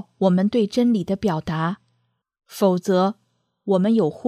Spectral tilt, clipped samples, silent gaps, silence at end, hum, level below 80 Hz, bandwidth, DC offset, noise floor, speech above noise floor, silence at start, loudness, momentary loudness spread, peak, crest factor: -7.5 dB/octave; under 0.1%; none; 0 s; none; -56 dBFS; 14.5 kHz; under 0.1%; -70 dBFS; 50 dB; 0.2 s; -21 LUFS; 14 LU; -6 dBFS; 16 dB